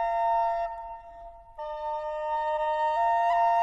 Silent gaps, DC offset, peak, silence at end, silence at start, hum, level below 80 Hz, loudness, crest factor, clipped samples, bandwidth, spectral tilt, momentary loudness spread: none; under 0.1%; -14 dBFS; 0 s; 0 s; none; -54 dBFS; -27 LUFS; 12 dB; under 0.1%; 7.8 kHz; -2.5 dB/octave; 19 LU